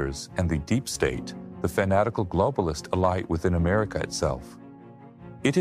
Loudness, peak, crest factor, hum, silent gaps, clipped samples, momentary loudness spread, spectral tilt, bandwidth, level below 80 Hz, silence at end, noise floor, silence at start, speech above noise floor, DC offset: -26 LUFS; -10 dBFS; 16 dB; none; none; under 0.1%; 15 LU; -6 dB/octave; 15.5 kHz; -42 dBFS; 0 s; -47 dBFS; 0 s; 21 dB; under 0.1%